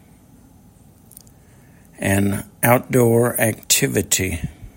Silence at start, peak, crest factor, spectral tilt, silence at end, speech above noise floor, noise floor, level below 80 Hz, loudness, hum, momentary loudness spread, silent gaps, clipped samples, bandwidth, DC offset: 2 s; 0 dBFS; 20 dB; -4 dB/octave; 0.1 s; 31 dB; -49 dBFS; -46 dBFS; -18 LUFS; none; 8 LU; none; under 0.1%; 16.5 kHz; under 0.1%